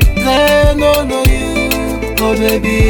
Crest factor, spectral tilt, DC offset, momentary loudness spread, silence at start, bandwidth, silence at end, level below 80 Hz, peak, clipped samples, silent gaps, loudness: 10 dB; -5 dB/octave; under 0.1%; 5 LU; 0 s; 19.5 kHz; 0 s; -18 dBFS; 0 dBFS; under 0.1%; none; -12 LUFS